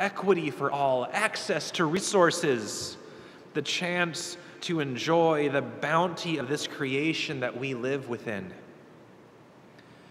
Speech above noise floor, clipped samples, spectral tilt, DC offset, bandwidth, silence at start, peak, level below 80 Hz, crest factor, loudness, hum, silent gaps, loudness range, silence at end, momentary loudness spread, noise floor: 25 dB; under 0.1%; -4 dB/octave; under 0.1%; 15 kHz; 0 s; -8 dBFS; -74 dBFS; 22 dB; -28 LUFS; none; none; 5 LU; 0.15 s; 13 LU; -53 dBFS